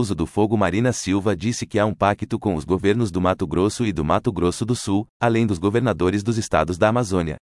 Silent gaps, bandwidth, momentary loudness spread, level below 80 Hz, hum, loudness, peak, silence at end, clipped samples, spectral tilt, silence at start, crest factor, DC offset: 5.09-5.20 s; 12 kHz; 4 LU; -46 dBFS; none; -21 LUFS; -4 dBFS; 0.05 s; under 0.1%; -6 dB/octave; 0 s; 16 dB; under 0.1%